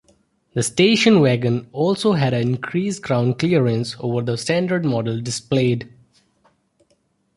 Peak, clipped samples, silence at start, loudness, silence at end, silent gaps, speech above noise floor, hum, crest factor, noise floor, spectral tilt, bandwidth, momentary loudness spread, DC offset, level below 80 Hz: -2 dBFS; under 0.1%; 0.55 s; -19 LUFS; 1.5 s; none; 46 dB; none; 16 dB; -65 dBFS; -5.5 dB/octave; 11.5 kHz; 9 LU; under 0.1%; -56 dBFS